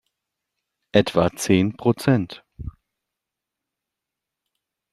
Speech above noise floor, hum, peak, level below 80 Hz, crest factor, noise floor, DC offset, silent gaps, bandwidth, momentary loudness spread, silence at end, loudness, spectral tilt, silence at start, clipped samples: 65 dB; none; -2 dBFS; -50 dBFS; 24 dB; -85 dBFS; under 0.1%; none; 14 kHz; 20 LU; 2.2 s; -21 LUFS; -6 dB/octave; 0.95 s; under 0.1%